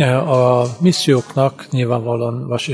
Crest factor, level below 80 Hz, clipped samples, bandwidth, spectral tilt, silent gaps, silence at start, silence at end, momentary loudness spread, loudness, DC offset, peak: 14 dB; -58 dBFS; under 0.1%; 11 kHz; -6 dB/octave; none; 0 s; 0 s; 7 LU; -16 LUFS; under 0.1%; -2 dBFS